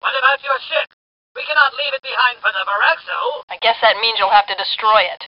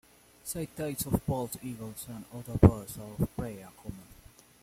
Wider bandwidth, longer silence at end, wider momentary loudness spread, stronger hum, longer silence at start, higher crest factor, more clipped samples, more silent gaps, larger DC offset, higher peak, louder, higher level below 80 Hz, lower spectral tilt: second, 5.6 kHz vs 16.5 kHz; second, 0 s vs 0.6 s; second, 8 LU vs 21 LU; neither; second, 0.05 s vs 0.45 s; second, 18 dB vs 28 dB; neither; first, 0.93-1.35 s, 3.43-3.48 s vs none; neither; first, 0 dBFS vs -4 dBFS; first, -16 LUFS vs -31 LUFS; second, -62 dBFS vs -46 dBFS; second, 5 dB/octave vs -7 dB/octave